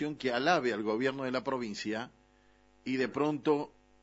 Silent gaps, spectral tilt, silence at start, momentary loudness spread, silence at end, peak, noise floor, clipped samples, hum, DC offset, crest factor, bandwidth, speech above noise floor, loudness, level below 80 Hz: none; -5 dB/octave; 0 s; 11 LU; 0.35 s; -14 dBFS; -64 dBFS; under 0.1%; 50 Hz at -70 dBFS; under 0.1%; 20 dB; 8 kHz; 32 dB; -32 LUFS; -70 dBFS